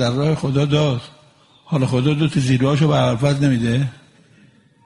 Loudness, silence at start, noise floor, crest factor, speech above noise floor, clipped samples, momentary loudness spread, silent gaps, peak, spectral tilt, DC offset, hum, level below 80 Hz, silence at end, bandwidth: -18 LUFS; 0 s; -52 dBFS; 16 dB; 35 dB; under 0.1%; 6 LU; none; -2 dBFS; -7 dB/octave; under 0.1%; none; -48 dBFS; 0.9 s; 11.5 kHz